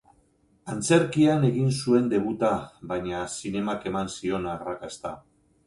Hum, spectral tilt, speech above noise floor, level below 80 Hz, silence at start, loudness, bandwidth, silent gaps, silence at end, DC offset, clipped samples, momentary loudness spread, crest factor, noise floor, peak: none; -6 dB/octave; 39 dB; -56 dBFS; 0.65 s; -26 LUFS; 11.5 kHz; none; 0.5 s; under 0.1%; under 0.1%; 15 LU; 18 dB; -64 dBFS; -8 dBFS